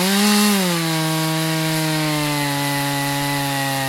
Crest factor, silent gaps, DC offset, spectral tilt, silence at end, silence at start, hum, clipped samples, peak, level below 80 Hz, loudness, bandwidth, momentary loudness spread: 16 dB; none; under 0.1%; -4 dB/octave; 0 s; 0 s; none; under 0.1%; -4 dBFS; -52 dBFS; -18 LUFS; 16.5 kHz; 5 LU